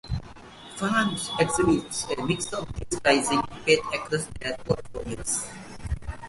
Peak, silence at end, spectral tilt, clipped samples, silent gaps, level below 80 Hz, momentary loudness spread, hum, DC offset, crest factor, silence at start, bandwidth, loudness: -6 dBFS; 0 s; -4 dB/octave; under 0.1%; none; -42 dBFS; 13 LU; none; under 0.1%; 22 dB; 0.05 s; 11.5 kHz; -26 LUFS